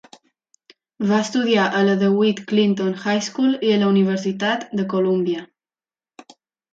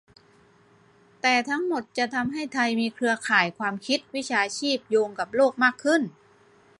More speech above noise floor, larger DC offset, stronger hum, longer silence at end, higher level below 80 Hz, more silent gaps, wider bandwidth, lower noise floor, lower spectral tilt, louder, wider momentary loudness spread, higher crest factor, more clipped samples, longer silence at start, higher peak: first, over 71 dB vs 33 dB; neither; neither; first, 1.3 s vs 0.7 s; about the same, -68 dBFS vs -72 dBFS; neither; second, 7.8 kHz vs 11.5 kHz; first, under -90 dBFS vs -58 dBFS; first, -5.5 dB/octave vs -3.5 dB/octave; first, -19 LUFS vs -25 LUFS; about the same, 6 LU vs 6 LU; second, 14 dB vs 20 dB; neither; second, 1 s vs 1.25 s; about the same, -6 dBFS vs -6 dBFS